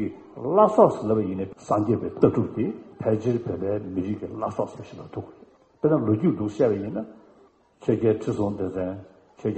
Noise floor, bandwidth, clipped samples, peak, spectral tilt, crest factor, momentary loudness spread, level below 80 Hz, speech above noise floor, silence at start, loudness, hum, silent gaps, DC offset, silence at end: -57 dBFS; 8.4 kHz; under 0.1%; -2 dBFS; -9 dB/octave; 22 dB; 15 LU; -58 dBFS; 33 dB; 0 s; -25 LUFS; none; none; under 0.1%; 0 s